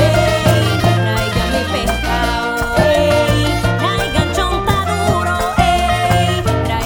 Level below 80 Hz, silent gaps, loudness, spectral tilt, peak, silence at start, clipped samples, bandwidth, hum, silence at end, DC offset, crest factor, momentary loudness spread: -26 dBFS; none; -15 LUFS; -5 dB/octave; 0 dBFS; 0 s; under 0.1%; over 20 kHz; none; 0 s; under 0.1%; 14 dB; 4 LU